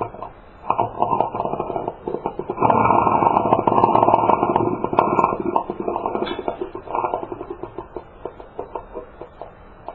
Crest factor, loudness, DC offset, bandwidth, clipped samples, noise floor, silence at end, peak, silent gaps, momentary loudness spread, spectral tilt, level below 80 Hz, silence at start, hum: 20 dB; -20 LUFS; under 0.1%; 5 kHz; under 0.1%; -40 dBFS; 0 s; 0 dBFS; none; 21 LU; -9.5 dB/octave; -48 dBFS; 0 s; none